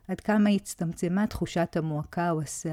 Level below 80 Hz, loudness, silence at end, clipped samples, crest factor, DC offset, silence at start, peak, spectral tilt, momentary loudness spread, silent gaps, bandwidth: -52 dBFS; -28 LUFS; 0 s; under 0.1%; 14 dB; under 0.1%; 0.1 s; -14 dBFS; -6 dB/octave; 7 LU; none; 14 kHz